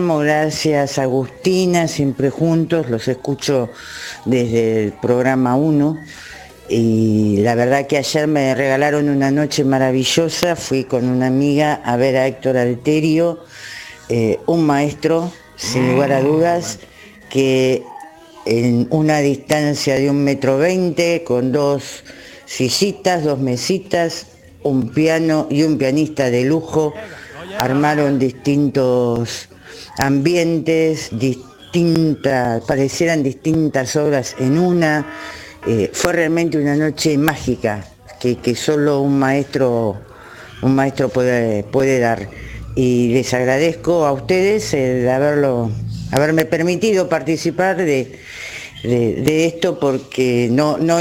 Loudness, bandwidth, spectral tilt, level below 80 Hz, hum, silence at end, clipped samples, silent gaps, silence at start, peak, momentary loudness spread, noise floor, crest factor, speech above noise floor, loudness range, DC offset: -17 LUFS; 17 kHz; -5.5 dB/octave; -46 dBFS; none; 0 s; under 0.1%; none; 0 s; 0 dBFS; 11 LU; -37 dBFS; 16 dB; 22 dB; 2 LU; under 0.1%